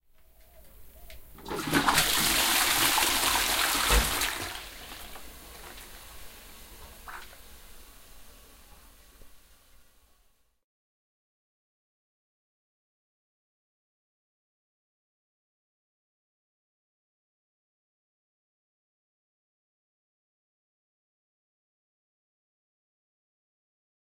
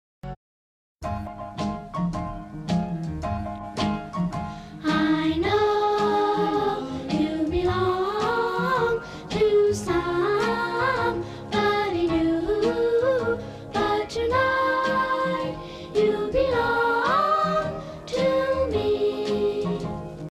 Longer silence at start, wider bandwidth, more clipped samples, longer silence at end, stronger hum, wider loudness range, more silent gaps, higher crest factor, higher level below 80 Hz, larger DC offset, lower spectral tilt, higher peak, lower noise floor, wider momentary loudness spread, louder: first, 0.65 s vs 0.25 s; first, 16 kHz vs 14 kHz; neither; first, 14.65 s vs 0 s; neither; first, 24 LU vs 6 LU; second, none vs 0.36-0.96 s; first, 26 dB vs 14 dB; about the same, -46 dBFS vs -44 dBFS; neither; second, -1 dB/octave vs -6 dB/octave; about the same, -8 dBFS vs -10 dBFS; second, -67 dBFS vs under -90 dBFS; first, 24 LU vs 11 LU; about the same, -24 LUFS vs -24 LUFS